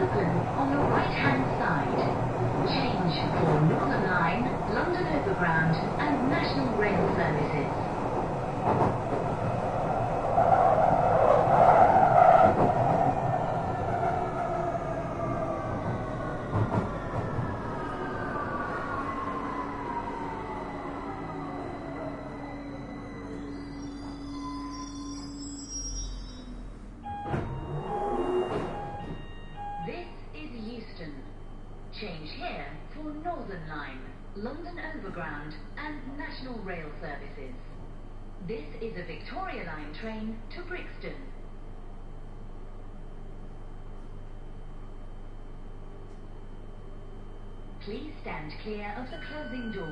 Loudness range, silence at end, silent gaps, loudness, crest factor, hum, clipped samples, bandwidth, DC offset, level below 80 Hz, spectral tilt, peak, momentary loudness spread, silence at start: 21 LU; 0 s; none; -29 LUFS; 22 dB; none; under 0.1%; 10.5 kHz; under 0.1%; -42 dBFS; -7 dB/octave; -6 dBFS; 23 LU; 0 s